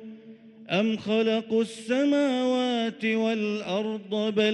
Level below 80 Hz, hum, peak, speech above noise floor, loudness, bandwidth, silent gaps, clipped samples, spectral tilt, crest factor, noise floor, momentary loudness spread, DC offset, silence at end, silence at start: -74 dBFS; none; -12 dBFS; 23 dB; -26 LUFS; 11 kHz; none; under 0.1%; -5.5 dB/octave; 14 dB; -48 dBFS; 5 LU; under 0.1%; 0 s; 0 s